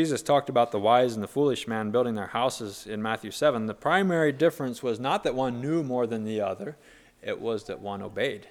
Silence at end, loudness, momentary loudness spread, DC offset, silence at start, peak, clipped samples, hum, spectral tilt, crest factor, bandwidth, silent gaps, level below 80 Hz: 0 s; -27 LUFS; 12 LU; under 0.1%; 0 s; -8 dBFS; under 0.1%; none; -5.5 dB/octave; 20 dB; 17 kHz; none; -62 dBFS